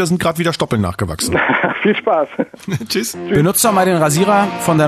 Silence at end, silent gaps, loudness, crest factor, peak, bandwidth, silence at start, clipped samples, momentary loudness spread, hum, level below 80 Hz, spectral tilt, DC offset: 0 s; none; -15 LUFS; 14 dB; -2 dBFS; 14 kHz; 0 s; under 0.1%; 8 LU; none; -46 dBFS; -4.5 dB/octave; under 0.1%